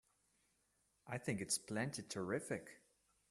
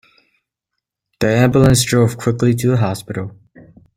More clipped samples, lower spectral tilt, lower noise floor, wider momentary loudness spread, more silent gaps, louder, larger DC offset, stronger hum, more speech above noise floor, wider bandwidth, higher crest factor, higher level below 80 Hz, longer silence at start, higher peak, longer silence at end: neither; second, -4 dB/octave vs -5.5 dB/octave; about the same, -81 dBFS vs -79 dBFS; second, 8 LU vs 14 LU; neither; second, -43 LUFS vs -15 LUFS; neither; neither; second, 37 dB vs 65 dB; second, 13.5 kHz vs 16 kHz; first, 22 dB vs 16 dB; second, -80 dBFS vs -40 dBFS; second, 1.05 s vs 1.2 s; second, -24 dBFS vs 0 dBFS; second, 0.5 s vs 0.65 s